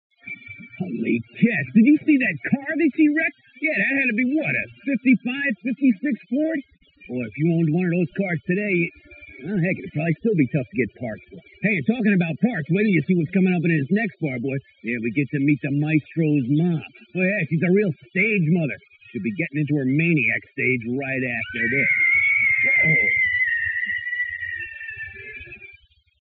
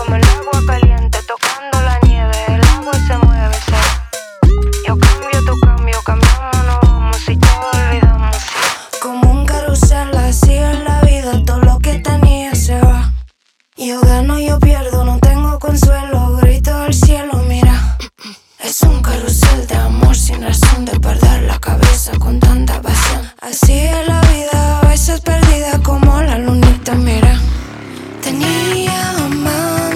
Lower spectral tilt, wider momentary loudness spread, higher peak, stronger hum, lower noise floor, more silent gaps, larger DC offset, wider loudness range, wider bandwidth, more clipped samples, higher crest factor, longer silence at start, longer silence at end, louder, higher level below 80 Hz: first, -10 dB/octave vs -5.5 dB/octave; first, 14 LU vs 5 LU; second, -6 dBFS vs 0 dBFS; neither; about the same, -52 dBFS vs -55 dBFS; neither; neither; first, 6 LU vs 1 LU; second, 4.3 kHz vs 15.5 kHz; neither; first, 16 dB vs 10 dB; first, 0.25 s vs 0 s; first, 0.5 s vs 0 s; second, -21 LUFS vs -12 LUFS; second, -62 dBFS vs -12 dBFS